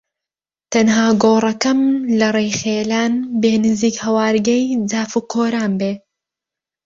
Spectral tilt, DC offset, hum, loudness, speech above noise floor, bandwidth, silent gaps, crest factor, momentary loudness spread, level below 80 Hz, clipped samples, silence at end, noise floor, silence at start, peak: -4.5 dB/octave; under 0.1%; none; -16 LUFS; 73 dB; 7.6 kHz; none; 16 dB; 6 LU; -56 dBFS; under 0.1%; 0.9 s; -88 dBFS; 0.7 s; -2 dBFS